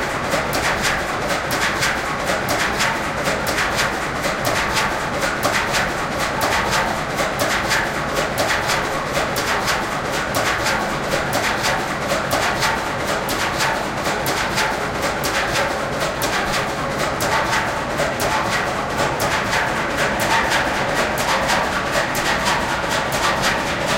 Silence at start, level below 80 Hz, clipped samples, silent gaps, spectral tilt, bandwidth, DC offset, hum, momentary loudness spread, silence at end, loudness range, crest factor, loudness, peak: 0 s; -38 dBFS; under 0.1%; none; -3 dB/octave; 17 kHz; under 0.1%; none; 3 LU; 0 s; 2 LU; 16 dB; -19 LUFS; -4 dBFS